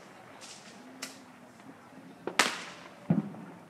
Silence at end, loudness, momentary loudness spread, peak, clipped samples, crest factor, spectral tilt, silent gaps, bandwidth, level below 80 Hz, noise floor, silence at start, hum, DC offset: 0 s; -33 LUFS; 24 LU; -2 dBFS; under 0.1%; 36 dB; -3.5 dB/octave; none; 15.5 kHz; -76 dBFS; -52 dBFS; 0 s; none; under 0.1%